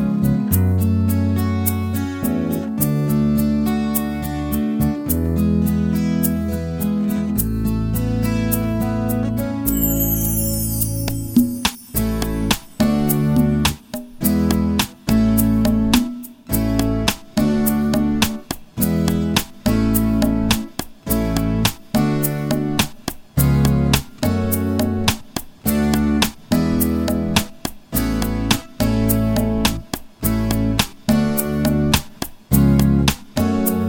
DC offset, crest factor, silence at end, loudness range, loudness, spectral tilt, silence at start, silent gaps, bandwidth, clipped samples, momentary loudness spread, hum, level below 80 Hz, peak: under 0.1%; 18 dB; 0 s; 2 LU; -19 LUFS; -5.5 dB/octave; 0 s; none; 17 kHz; under 0.1%; 6 LU; none; -30 dBFS; 0 dBFS